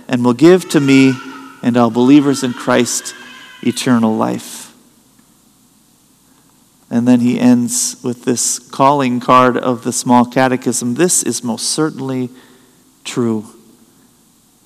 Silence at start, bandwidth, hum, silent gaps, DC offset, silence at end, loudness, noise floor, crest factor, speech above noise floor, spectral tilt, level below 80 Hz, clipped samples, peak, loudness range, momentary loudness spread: 0.1 s; 15 kHz; none; none; under 0.1%; 1.15 s; -13 LUFS; -51 dBFS; 14 dB; 38 dB; -4.5 dB/octave; -62 dBFS; 0.4%; 0 dBFS; 7 LU; 14 LU